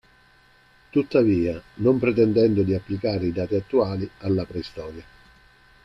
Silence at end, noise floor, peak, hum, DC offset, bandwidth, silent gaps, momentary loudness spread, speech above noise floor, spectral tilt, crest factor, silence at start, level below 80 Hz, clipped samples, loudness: 0.8 s; -56 dBFS; -6 dBFS; none; under 0.1%; 6.2 kHz; none; 13 LU; 34 dB; -9 dB/octave; 18 dB; 0.95 s; -52 dBFS; under 0.1%; -23 LUFS